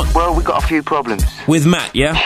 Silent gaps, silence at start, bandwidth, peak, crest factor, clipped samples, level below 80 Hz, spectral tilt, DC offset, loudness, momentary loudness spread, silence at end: none; 0 s; 15.5 kHz; 0 dBFS; 14 dB; under 0.1%; -22 dBFS; -5 dB/octave; 0.2%; -15 LUFS; 5 LU; 0 s